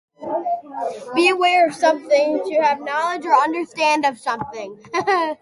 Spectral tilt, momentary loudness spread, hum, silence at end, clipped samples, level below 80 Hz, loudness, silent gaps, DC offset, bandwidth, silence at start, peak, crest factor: -3 dB/octave; 12 LU; none; 0.05 s; under 0.1%; -66 dBFS; -19 LUFS; none; under 0.1%; 11.5 kHz; 0.2 s; -4 dBFS; 16 dB